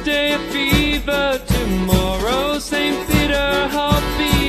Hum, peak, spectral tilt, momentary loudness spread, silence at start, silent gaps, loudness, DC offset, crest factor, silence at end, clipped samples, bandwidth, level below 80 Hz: none; -2 dBFS; -4.5 dB/octave; 3 LU; 0 s; none; -18 LUFS; under 0.1%; 16 dB; 0 s; under 0.1%; 14 kHz; -26 dBFS